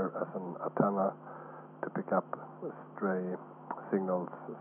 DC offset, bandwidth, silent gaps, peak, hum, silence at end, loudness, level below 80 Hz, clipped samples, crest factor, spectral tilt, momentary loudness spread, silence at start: under 0.1%; 3.2 kHz; none; -14 dBFS; none; 0 s; -36 LUFS; under -90 dBFS; under 0.1%; 22 dB; -12 dB/octave; 13 LU; 0 s